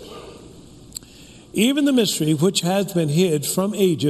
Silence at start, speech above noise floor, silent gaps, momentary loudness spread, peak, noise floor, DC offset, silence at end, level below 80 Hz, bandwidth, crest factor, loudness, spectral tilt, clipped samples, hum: 0 s; 26 dB; none; 18 LU; -4 dBFS; -44 dBFS; under 0.1%; 0 s; -56 dBFS; 14 kHz; 16 dB; -19 LUFS; -5 dB/octave; under 0.1%; none